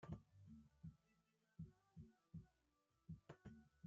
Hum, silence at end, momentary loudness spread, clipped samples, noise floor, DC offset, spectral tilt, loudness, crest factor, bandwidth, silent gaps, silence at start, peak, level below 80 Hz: none; 0 s; 7 LU; under 0.1%; -86 dBFS; under 0.1%; -8.5 dB/octave; -63 LUFS; 20 dB; 7.2 kHz; none; 0 s; -42 dBFS; -76 dBFS